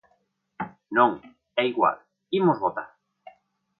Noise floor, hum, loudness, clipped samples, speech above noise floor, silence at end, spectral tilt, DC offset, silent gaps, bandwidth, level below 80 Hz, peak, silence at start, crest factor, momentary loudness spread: -70 dBFS; none; -24 LUFS; under 0.1%; 47 dB; 0.95 s; -9.5 dB/octave; under 0.1%; none; 5.2 kHz; -70 dBFS; -6 dBFS; 0.6 s; 20 dB; 17 LU